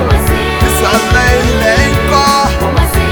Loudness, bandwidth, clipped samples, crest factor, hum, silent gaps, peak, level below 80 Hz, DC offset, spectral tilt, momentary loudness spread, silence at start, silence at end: -10 LUFS; over 20 kHz; 0.1%; 10 dB; none; none; 0 dBFS; -16 dBFS; under 0.1%; -4.5 dB/octave; 3 LU; 0 s; 0 s